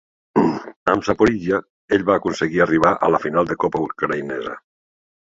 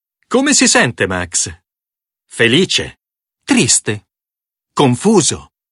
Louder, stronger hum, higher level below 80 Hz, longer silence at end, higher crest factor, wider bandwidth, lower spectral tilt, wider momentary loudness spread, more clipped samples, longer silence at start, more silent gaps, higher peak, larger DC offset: second, -19 LUFS vs -13 LUFS; neither; second, -50 dBFS vs -44 dBFS; first, 0.65 s vs 0.3 s; about the same, 18 dB vs 16 dB; second, 7.8 kHz vs 11.5 kHz; first, -6.5 dB/octave vs -3 dB/octave; second, 8 LU vs 17 LU; neither; about the same, 0.35 s vs 0.3 s; first, 0.76-0.86 s, 1.70-1.88 s vs none; about the same, 0 dBFS vs 0 dBFS; neither